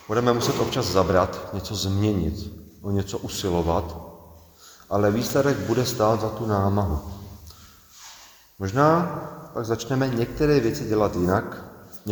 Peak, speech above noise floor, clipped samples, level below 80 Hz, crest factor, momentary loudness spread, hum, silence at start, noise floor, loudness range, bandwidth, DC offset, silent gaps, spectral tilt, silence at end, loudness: -4 dBFS; 27 dB; under 0.1%; -42 dBFS; 20 dB; 18 LU; none; 0 s; -50 dBFS; 4 LU; over 20 kHz; under 0.1%; none; -6 dB/octave; 0 s; -24 LUFS